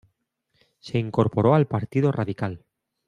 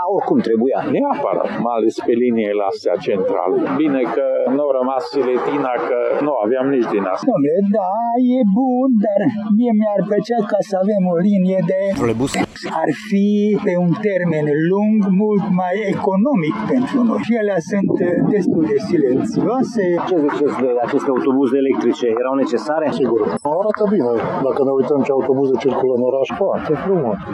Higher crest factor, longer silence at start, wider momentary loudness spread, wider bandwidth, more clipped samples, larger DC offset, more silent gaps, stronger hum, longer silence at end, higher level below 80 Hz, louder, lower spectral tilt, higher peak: first, 20 dB vs 14 dB; first, 0.85 s vs 0 s; first, 12 LU vs 3 LU; about the same, 10 kHz vs 11 kHz; neither; neither; neither; neither; first, 0.5 s vs 0 s; about the same, -60 dBFS vs -56 dBFS; second, -23 LUFS vs -17 LUFS; first, -9 dB/octave vs -7.5 dB/octave; about the same, -6 dBFS vs -4 dBFS